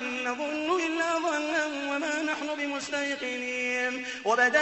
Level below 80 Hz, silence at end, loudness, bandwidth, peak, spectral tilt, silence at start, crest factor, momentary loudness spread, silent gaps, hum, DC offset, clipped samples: -72 dBFS; 0 s; -28 LUFS; 8.4 kHz; -10 dBFS; -1.5 dB/octave; 0 s; 18 dB; 4 LU; none; none; under 0.1%; under 0.1%